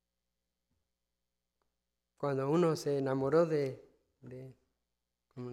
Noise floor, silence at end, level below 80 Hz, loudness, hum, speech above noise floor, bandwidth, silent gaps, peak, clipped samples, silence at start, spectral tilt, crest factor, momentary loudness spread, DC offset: -88 dBFS; 0 s; -78 dBFS; -32 LUFS; 60 Hz at -65 dBFS; 56 dB; 14.5 kHz; none; -16 dBFS; under 0.1%; 2.2 s; -7 dB/octave; 20 dB; 21 LU; under 0.1%